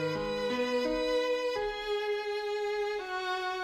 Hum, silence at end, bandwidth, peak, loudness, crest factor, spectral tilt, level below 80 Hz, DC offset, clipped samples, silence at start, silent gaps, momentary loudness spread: none; 0 s; 15.5 kHz; -20 dBFS; -32 LUFS; 12 dB; -4 dB/octave; -56 dBFS; under 0.1%; under 0.1%; 0 s; none; 4 LU